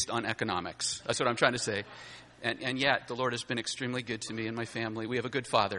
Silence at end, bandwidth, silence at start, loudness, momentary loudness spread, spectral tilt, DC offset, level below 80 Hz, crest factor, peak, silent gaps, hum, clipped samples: 0 s; 11.5 kHz; 0 s; -32 LUFS; 8 LU; -3.5 dB/octave; under 0.1%; -66 dBFS; 24 dB; -8 dBFS; none; none; under 0.1%